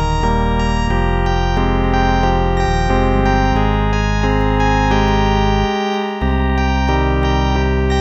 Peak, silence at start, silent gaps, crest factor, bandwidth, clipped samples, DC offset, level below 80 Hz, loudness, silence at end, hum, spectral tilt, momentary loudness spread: 0 dBFS; 0 s; none; 14 dB; 8 kHz; under 0.1%; under 0.1%; -18 dBFS; -16 LUFS; 0 s; none; -6.5 dB/octave; 3 LU